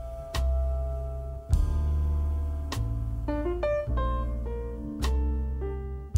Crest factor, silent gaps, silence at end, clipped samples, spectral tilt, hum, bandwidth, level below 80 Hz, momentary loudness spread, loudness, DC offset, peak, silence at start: 16 dB; none; 0 s; under 0.1%; -7 dB/octave; none; 12 kHz; -30 dBFS; 7 LU; -31 LUFS; under 0.1%; -12 dBFS; 0 s